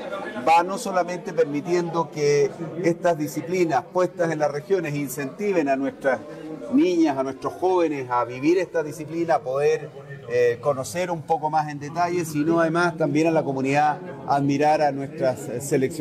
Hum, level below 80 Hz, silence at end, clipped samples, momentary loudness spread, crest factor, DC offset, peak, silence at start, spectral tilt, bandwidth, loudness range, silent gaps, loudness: none; -64 dBFS; 0 s; under 0.1%; 8 LU; 14 dB; under 0.1%; -10 dBFS; 0 s; -6 dB/octave; 15 kHz; 2 LU; none; -23 LUFS